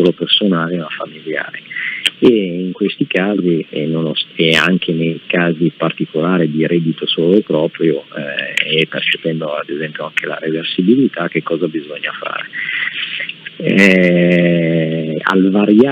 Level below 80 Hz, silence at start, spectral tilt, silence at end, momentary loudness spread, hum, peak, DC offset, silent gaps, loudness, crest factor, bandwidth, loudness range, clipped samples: -62 dBFS; 0 s; -6 dB/octave; 0 s; 11 LU; none; 0 dBFS; under 0.1%; none; -15 LUFS; 14 dB; 10 kHz; 4 LU; under 0.1%